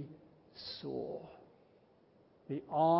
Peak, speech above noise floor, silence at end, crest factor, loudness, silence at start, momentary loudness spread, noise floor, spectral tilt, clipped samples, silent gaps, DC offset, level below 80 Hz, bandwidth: -20 dBFS; 33 dB; 0 s; 18 dB; -41 LUFS; 0 s; 21 LU; -67 dBFS; -6 dB/octave; under 0.1%; none; under 0.1%; -76 dBFS; 5.6 kHz